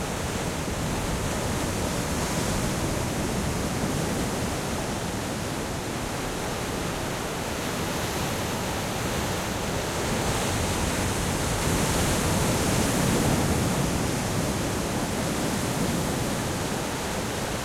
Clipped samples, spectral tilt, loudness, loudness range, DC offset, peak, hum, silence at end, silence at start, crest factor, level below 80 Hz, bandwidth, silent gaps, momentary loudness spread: under 0.1%; -4 dB/octave; -27 LUFS; 5 LU; under 0.1%; -12 dBFS; none; 0 s; 0 s; 16 dB; -38 dBFS; 16.5 kHz; none; 6 LU